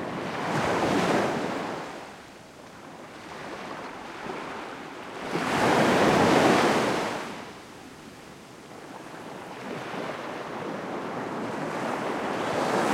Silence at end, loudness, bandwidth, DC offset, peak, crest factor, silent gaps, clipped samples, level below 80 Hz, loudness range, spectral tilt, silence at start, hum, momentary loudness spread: 0 s; -27 LUFS; 16.5 kHz; under 0.1%; -8 dBFS; 20 dB; none; under 0.1%; -60 dBFS; 14 LU; -4.5 dB/octave; 0 s; none; 23 LU